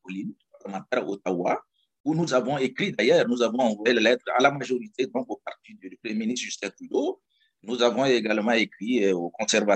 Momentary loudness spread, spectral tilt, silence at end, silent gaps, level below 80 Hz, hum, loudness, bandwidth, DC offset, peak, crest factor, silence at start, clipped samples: 16 LU; -4 dB/octave; 0 s; 2.00-2.04 s; -74 dBFS; none; -25 LUFS; 9 kHz; under 0.1%; -6 dBFS; 20 dB; 0.05 s; under 0.1%